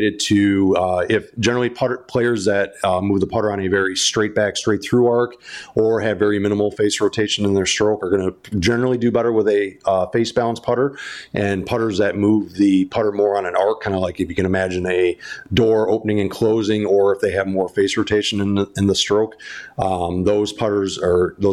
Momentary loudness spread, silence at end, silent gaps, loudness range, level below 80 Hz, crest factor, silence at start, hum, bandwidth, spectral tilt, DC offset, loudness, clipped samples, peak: 5 LU; 0 s; none; 1 LU; -48 dBFS; 12 dB; 0 s; none; 13.5 kHz; -5 dB/octave; under 0.1%; -19 LUFS; under 0.1%; -6 dBFS